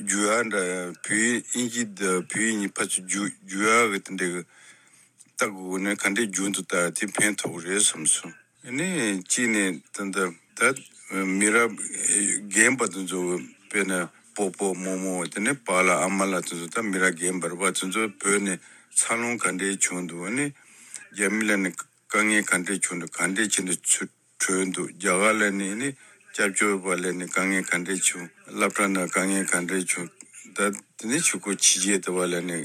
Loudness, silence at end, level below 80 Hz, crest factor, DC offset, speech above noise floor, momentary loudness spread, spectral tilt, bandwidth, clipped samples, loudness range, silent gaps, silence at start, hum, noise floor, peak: -24 LUFS; 0 s; -80 dBFS; 22 dB; under 0.1%; 31 dB; 10 LU; -2.5 dB/octave; 15.5 kHz; under 0.1%; 3 LU; none; 0 s; none; -56 dBFS; -4 dBFS